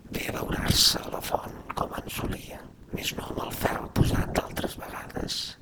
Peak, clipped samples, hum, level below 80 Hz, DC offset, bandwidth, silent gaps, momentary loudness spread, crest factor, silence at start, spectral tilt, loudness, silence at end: -6 dBFS; under 0.1%; none; -40 dBFS; under 0.1%; over 20 kHz; none; 16 LU; 22 dB; 0 s; -3.5 dB/octave; -28 LUFS; 0.05 s